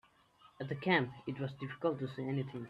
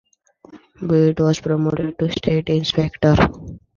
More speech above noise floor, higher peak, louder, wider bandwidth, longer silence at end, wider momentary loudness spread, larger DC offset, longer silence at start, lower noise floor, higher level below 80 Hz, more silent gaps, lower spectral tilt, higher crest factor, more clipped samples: about the same, 29 dB vs 31 dB; second, -16 dBFS vs -2 dBFS; second, -37 LUFS vs -18 LUFS; about the same, 7.2 kHz vs 7.2 kHz; second, 0 s vs 0.2 s; first, 10 LU vs 7 LU; neither; about the same, 0.45 s vs 0.55 s; first, -66 dBFS vs -48 dBFS; second, -74 dBFS vs -38 dBFS; neither; about the same, -8 dB/octave vs -7 dB/octave; about the same, 22 dB vs 18 dB; neither